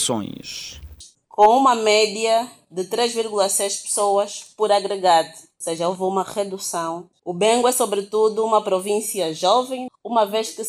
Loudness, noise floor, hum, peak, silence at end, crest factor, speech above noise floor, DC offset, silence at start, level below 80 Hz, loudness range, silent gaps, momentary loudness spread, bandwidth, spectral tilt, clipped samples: -20 LUFS; -45 dBFS; none; -2 dBFS; 0 s; 18 dB; 25 dB; under 0.1%; 0 s; -56 dBFS; 3 LU; none; 15 LU; 19 kHz; -2.5 dB/octave; under 0.1%